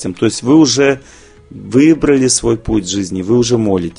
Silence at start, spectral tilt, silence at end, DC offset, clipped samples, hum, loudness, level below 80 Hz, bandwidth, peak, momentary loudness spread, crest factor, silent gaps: 0 s; -4.5 dB/octave; 0.05 s; under 0.1%; under 0.1%; none; -12 LUFS; -36 dBFS; 10.5 kHz; 0 dBFS; 7 LU; 12 dB; none